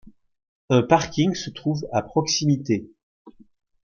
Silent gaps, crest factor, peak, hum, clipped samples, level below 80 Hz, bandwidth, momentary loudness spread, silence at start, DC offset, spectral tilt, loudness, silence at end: 0.48-0.68 s, 3.03-3.25 s; 20 dB; -4 dBFS; none; under 0.1%; -56 dBFS; 7.2 kHz; 8 LU; 0.05 s; under 0.1%; -5 dB/octave; -22 LUFS; 0.55 s